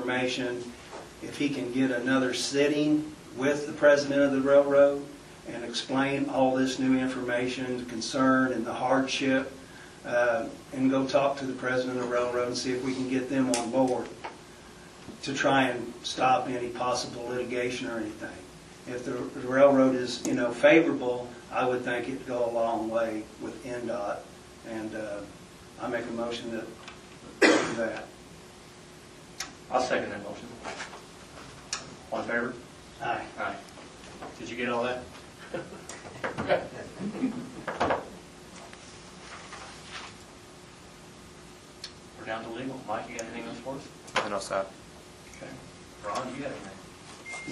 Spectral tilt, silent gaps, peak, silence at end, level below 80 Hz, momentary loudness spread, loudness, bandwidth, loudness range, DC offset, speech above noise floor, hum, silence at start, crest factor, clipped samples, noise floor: -4.5 dB/octave; none; -6 dBFS; 0 s; -62 dBFS; 22 LU; -28 LUFS; 12.5 kHz; 12 LU; under 0.1%; 21 dB; none; 0 s; 24 dB; under 0.1%; -49 dBFS